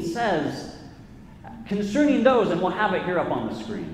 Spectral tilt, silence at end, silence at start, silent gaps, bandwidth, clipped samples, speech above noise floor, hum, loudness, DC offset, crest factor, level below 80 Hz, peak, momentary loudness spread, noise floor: -6 dB/octave; 0 s; 0 s; none; 12.5 kHz; under 0.1%; 22 dB; none; -23 LUFS; under 0.1%; 18 dB; -52 dBFS; -6 dBFS; 22 LU; -44 dBFS